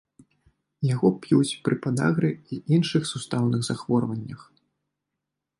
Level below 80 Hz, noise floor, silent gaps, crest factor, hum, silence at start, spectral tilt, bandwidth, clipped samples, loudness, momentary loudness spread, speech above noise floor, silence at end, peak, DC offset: -64 dBFS; -84 dBFS; none; 18 dB; none; 0.8 s; -6.5 dB/octave; 11.5 kHz; under 0.1%; -25 LUFS; 10 LU; 60 dB; 1.2 s; -8 dBFS; under 0.1%